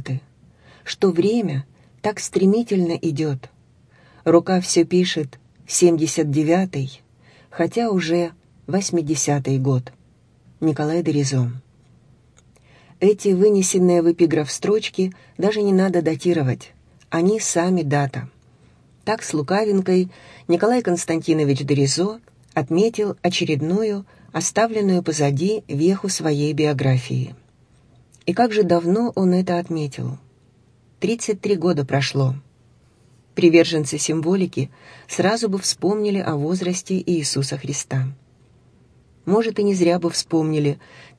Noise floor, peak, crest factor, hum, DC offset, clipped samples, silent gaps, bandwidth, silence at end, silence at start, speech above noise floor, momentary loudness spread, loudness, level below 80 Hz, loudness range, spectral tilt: -55 dBFS; -2 dBFS; 20 dB; none; under 0.1%; under 0.1%; none; 11 kHz; 0.15 s; 0 s; 36 dB; 11 LU; -20 LUFS; -60 dBFS; 4 LU; -5.5 dB/octave